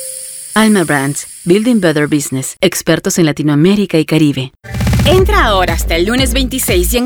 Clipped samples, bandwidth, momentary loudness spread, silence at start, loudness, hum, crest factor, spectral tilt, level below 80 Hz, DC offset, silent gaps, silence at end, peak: under 0.1%; over 20 kHz; 8 LU; 0 s; -12 LUFS; none; 12 dB; -4.5 dB/octave; -22 dBFS; under 0.1%; none; 0 s; 0 dBFS